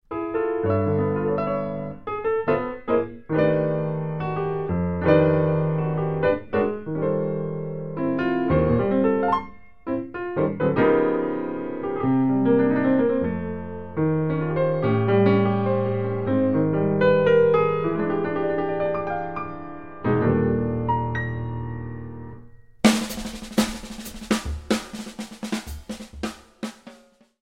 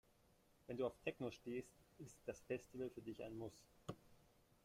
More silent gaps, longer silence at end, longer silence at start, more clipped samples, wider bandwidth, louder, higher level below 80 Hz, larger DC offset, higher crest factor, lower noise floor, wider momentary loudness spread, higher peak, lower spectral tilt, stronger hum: neither; second, 0 s vs 0.5 s; second, 0 s vs 0.7 s; neither; about the same, 16 kHz vs 16 kHz; first, -23 LUFS vs -51 LUFS; first, -46 dBFS vs -76 dBFS; first, 0.7% vs under 0.1%; about the same, 20 dB vs 22 dB; second, -53 dBFS vs -75 dBFS; about the same, 14 LU vs 15 LU; first, -2 dBFS vs -28 dBFS; about the same, -7 dB/octave vs -6 dB/octave; neither